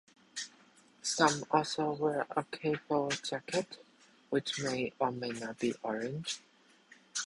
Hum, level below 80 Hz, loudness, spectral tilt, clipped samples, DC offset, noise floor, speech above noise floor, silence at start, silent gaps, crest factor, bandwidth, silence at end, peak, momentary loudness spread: none; -74 dBFS; -34 LUFS; -3.5 dB/octave; under 0.1%; under 0.1%; -63 dBFS; 29 dB; 0.35 s; none; 24 dB; 11.5 kHz; 0 s; -10 dBFS; 14 LU